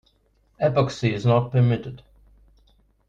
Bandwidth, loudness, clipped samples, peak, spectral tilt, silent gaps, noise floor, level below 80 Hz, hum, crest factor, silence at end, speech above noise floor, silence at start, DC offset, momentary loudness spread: 7.6 kHz; -22 LUFS; under 0.1%; -6 dBFS; -7.5 dB/octave; none; -63 dBFS; -52 dBFS; 50 Hz at -50 dBFS; 18 dB; 1.1 s; 42 dB; 0.6 s; under 0.1%; 7 LU